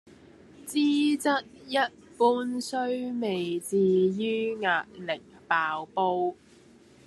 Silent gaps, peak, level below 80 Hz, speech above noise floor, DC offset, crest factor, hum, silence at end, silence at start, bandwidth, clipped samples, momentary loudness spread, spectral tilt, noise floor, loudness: none; -10 dBFS; -72 dBFS; 29 dB; under 0.1%; 18 dB; none; 0.75 s; 0.6 s; 13 kHz; under 0.1%; 8 LU; -5 dB/octave; -55 dBFS; -28 LUFS